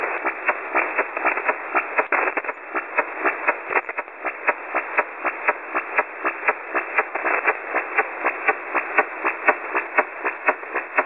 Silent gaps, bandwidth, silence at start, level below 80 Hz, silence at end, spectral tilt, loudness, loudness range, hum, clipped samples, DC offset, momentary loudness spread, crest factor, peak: none; 9.4 kHz; 0 s; -70 dBFS; 0 s; -5.5 dB/octave; -23 LUFS; 2 LU; none; under 0.1%; 0.1%; 5 LU; 22 dB; -2 dBFS